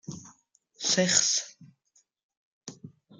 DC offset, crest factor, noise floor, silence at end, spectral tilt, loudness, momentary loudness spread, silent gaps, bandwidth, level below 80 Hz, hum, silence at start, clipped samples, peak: under 0.1%; 26 dB; -69 dBFS; 0.3 s; -1.5 dB/octave; -24 LUFS; 25 LU; 2.23-2.29 s, 2.37-2.61 s; 11 kHz; -74 dBFS; none; 0.1 s; under 0.1%; -6 dBFS